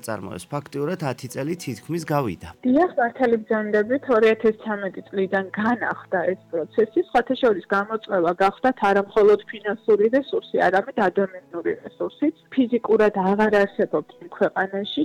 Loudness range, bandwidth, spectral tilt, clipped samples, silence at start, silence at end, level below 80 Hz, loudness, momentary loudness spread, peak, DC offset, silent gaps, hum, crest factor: 3 LU; 15 kHz; -6.5 dB/octave; under 0.1%; 0.05 s; 0 s; -58 dBFS; -22 LUFS; 10 LU; -8 dBFS; under 0.1%; none; none; 14 dB